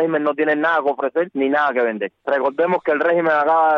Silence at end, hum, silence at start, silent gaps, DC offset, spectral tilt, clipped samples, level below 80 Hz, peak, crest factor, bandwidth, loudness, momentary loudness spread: 0 s; none; 0 s; none; under 0.1%; -7.5 dB/octave; under 0.1%; -68 dBFS; -8 dBFS; 10 dB; 6 kHz; -18 LUFS; 5 LU